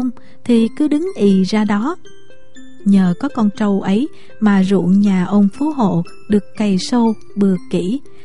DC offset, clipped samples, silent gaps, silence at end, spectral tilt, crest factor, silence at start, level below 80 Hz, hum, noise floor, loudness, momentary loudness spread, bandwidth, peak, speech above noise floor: 3%; under 0.1%; none; 0.25 s; -7.5 dB/octave; 14 dB; 0 s; -50 dBFS; none; -43 dBFS; -16 LUFS; 8 LU; 11 kHz; -2 dBFS; 28 dB